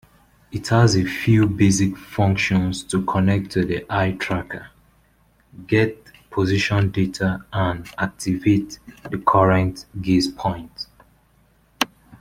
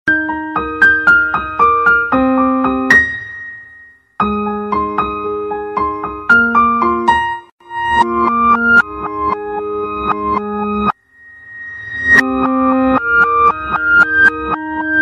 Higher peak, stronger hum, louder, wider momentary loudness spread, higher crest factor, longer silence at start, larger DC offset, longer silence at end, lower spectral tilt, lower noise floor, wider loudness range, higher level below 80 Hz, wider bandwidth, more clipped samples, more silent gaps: about the same, 0 dBFS vs 0 dBFS; neither; second, -21 LUFS vs -13 LUFS; about the same, 14 LU vs 12 LU; first, 20 dB vs 14 dB; first, 0.5 s vs 0.05 s; neither; first, 0.35 s vs 0 s; about the same, -6 dB/octave vs -5.5 dB/octave; first, -59 dBFS vs -42 dBFS; about the same, 4 LU vs 5 LU; second, -48 dBFS vs -40 dBFS; first, 15.5 kHz vs 11 kHz; neither; second, none vs 7.52-7.58 s